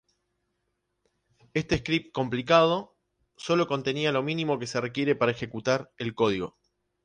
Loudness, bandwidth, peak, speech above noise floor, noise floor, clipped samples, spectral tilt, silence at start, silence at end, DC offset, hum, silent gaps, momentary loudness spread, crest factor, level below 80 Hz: -27 LUFS; 10 kHz; -6 dBFS; 52 dB; -78 dBFS; under 0.1%; -5.5 dB/octave; 1.55 s; 0.55 s; under 0.1%; none; none; 11 LU; 22 dB; -56 dBFS